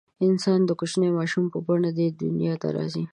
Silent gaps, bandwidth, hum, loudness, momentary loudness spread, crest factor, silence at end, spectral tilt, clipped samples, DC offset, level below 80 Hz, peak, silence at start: none; 11 kHz; none; -24 LUFS; 5 LU; 14 dB; 0.05 s; -7 dB/octave; under 0.1%; under 0.1%; -68 dBFS; -10 dBFS; 0.2 s